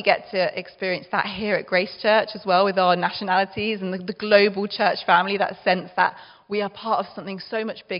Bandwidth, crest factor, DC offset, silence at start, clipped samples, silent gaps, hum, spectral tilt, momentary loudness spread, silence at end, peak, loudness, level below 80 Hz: 5.6 kHz; 22 dB; under 0.1%; 0 s; under 0.1%; none; none; -2 dB/octave; 10 LU; 0 s; 0 dBFS; -22 LUFS; -64 dBFS